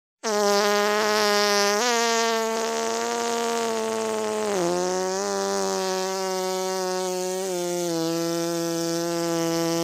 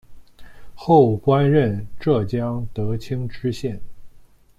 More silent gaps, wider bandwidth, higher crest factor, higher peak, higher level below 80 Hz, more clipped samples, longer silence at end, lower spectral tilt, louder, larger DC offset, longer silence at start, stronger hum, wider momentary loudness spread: neither; first, 16 kHz vs 12.5 kHz; about the same, 16 dB vs 18 dB; second, -8 dBFS vs -2 dBFS; second, -70 dBFS vs -44 dBFS; neither; second, 0 s vs 0.35 s; second, -3 dB/octave vs -8.5 dB/octave; second, -24 LUFS vs -20 LUFS; neither; first, 0.25 s vs 0.1 s; neither; second, 6 LU vs 14 LU